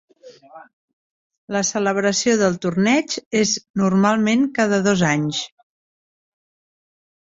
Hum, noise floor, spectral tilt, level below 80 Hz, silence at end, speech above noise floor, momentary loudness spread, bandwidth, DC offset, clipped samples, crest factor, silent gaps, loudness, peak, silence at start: none; under -90 dBFS; -4.5 dB/octave; -60 dBFS; 1.75 s; over 71 dB; 6 LU; 8 kHz; under 0.1%; under 0.1%; 18 dB; 0.73-1.30 s, 1.38-1.48 s, 3.26-3.31 s, 3.70-3.74 s; -19 LUFS; -4 dBFS; 0.25 s